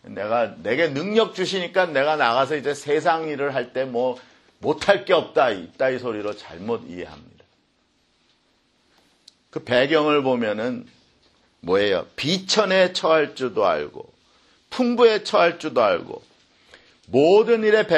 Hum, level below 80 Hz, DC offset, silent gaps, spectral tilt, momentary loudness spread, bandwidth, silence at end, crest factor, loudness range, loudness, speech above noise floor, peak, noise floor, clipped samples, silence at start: none; -64 dBFS; under 0.1%; none; -4.5 dB/octave; 13 LU; 11 kHz; 0 s; 22 dB; 7 LU; -21 LUFS; 44 dB; 0 dBFS; -65 dBFS; under 0.1%; 0.05 s